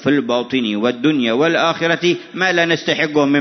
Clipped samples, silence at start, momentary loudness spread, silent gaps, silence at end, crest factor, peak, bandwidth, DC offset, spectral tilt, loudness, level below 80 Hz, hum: under 0.1%; 0 s; 4 LU; none; 0 s; 14 dB; -2 dBFS; 6.4 kHz; under 0.1%; -5 dB/octave; -16 LUFS; -62 dBFS; none